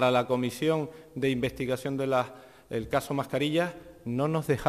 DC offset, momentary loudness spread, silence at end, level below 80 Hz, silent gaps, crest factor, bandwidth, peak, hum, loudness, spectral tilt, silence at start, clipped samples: under 0.1%; 9 LU; 0 s; -56 dBFS; none; 18 dB; 14.5 kHz; -10 dBFS; none; -29 LUFS; -6 dB/octave; 0 s; under 0.1%